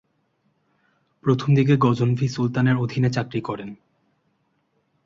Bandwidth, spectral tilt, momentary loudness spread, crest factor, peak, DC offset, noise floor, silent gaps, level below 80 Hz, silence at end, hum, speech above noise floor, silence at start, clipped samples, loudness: 7.6 kHz; -8 dB/octave; 11 LU; 18 dB; -4 dBFS; under 0.1%; -69 dBFS; none; -58 dBFS; 1.3 s; none; 49 dB; 1.25 s; under 0.1%; -21 LUFS